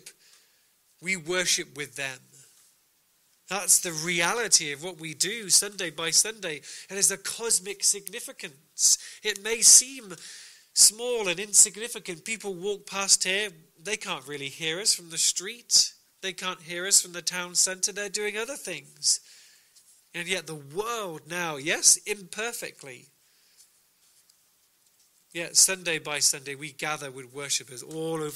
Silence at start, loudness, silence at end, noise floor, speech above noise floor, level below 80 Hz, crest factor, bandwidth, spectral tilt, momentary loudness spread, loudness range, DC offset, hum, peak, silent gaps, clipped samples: 0.05 s; -24 LUFS; 0 s; -67 dBFS; 40 dB; -70 dBFS; 26 dB; 16 kHz; 0 dB/octave; 18 LU; 9 LU; under 0.1%; none; -4 dBFS; none; under 0.1%